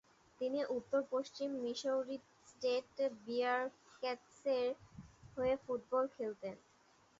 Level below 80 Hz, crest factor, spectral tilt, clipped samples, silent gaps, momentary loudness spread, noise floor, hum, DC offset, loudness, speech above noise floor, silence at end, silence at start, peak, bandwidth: -74 dBFS; 16 dB; -2.5 dB/octave; under 0.1%; none; 12 LU; -70 dBFS; none; under 0.1%; -40 LUFS; 31 dB; 0.65 s; 0.4 s; -24 dBFS; 7.6 kHz